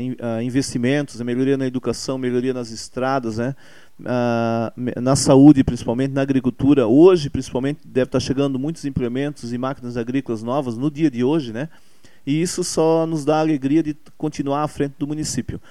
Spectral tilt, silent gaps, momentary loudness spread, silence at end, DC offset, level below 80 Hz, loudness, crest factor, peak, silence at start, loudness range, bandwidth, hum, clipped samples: -6 dB/octave; none; 12 LU; 0.1 s; 0.8%; -46 dBFS; -20 LUFS; 20 dB; 0 dBFS; 0 s; 8 LU; 13 kHz; none; under 0.1%